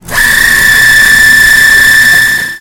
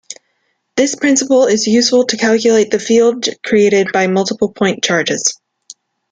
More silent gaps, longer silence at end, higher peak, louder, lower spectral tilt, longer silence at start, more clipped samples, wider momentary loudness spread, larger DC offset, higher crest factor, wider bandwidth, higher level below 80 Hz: neither; second, 0 s vs 0.75 s; about the same, 0 dBFS vs -2 dBFS; first, -2 LUFS vs -13 LUFS; second, 0 dB/octave vs -3.5 dB/octave; about the same, 0.05 s vs 0.1 s; first, 7% vs under 0.1%; about the same, 4 LU vs 6 LU; neither; second, 4 dB vs 12 dB; first, over 20 kHz vs 9.8 kHz; first, -26 dBFS vs -58 dBFS